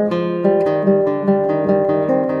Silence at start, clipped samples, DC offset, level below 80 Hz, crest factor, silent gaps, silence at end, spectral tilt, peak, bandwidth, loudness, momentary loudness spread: 0 s; under 0.1%; under 0.1%; -60 dBFS; 14 dB; none; 0 s; -9.5 dB/octave; -2 dBFS; 5.8 kHz; -16 LUFS; 2 LU